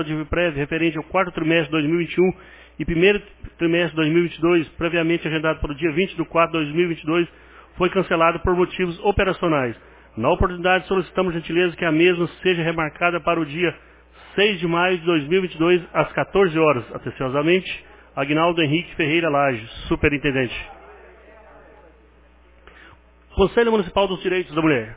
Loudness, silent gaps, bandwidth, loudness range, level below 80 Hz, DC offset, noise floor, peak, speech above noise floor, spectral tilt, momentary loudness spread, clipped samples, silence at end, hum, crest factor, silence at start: -20 LUFS; none; 4 kHz; 4 LU; -40 dBFS; under 0.1%; -52 dBFS; -4 dBFS; 31 dB; -10 dB/octave; 7 LU; under 0.1%; 0 s; none; 18 dB; 0 s